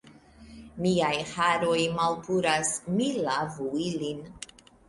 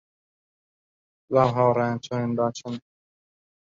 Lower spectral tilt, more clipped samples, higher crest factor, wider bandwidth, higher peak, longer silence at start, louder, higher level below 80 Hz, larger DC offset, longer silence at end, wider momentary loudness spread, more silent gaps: second, -4 dB/octave vs -7 dB/octave; neither; about the same, 18 dB vs 22 dB; first, 11.5 kHz vs 7.6 kHz; second, -12 dBFS vs -4 dBFS; second, 0.05 s vs 1.3 s; second, -27 LUFS vs -24 LUFS; about the same, -60 dBFS vs -62 dBFS; neither; second, 0.45 s vs 1 s; about the same, 14 LU vs 15 LU; neither